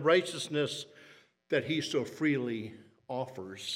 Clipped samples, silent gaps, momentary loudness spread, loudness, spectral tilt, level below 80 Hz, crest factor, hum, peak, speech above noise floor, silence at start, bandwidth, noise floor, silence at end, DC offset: under 0.1%; none; 12 LU; -33 LUFS; -4.5 dB/octave; -78 dBFS; 20 dB; none; -12 dBFS; 27 dB; 0 s; 15.5 kHz; -59 dBFS; 0 s; under 0.1%